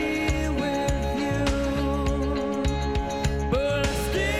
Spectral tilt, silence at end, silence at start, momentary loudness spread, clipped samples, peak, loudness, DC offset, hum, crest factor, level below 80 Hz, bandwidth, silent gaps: -5.5 dB/octave; 0 s; 0 s; 2 LU; under 0.1%; -12 dBFS; -26 LUFS; 0.3%; none; 14 dB; -32 dBFS; 16 kHz; none